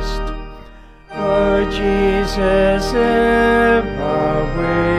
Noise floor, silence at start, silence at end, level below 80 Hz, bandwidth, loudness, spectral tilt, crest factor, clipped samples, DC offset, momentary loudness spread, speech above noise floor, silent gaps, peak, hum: -39 dBFS; 0 s; 0 s; -28 dBFS; 14.5 kHz; -16 LUFS; -6 dB/octave; 14 dB; under 0.1%; under 0.1%; 12 LU; 24 dB; none; -2 dBFS; none